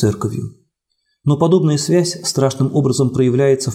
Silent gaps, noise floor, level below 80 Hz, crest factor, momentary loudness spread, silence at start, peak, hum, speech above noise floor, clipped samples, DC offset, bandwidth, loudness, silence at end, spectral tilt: none; -69 dBFS; -52 dBFS; 14 dB; 10 LU; 0 s; -2 dBFS; none; 54 dB; under 0.1%; under 0.1%; 15.5 kHz; -16 LUFS; 0 s; -6 dB/octave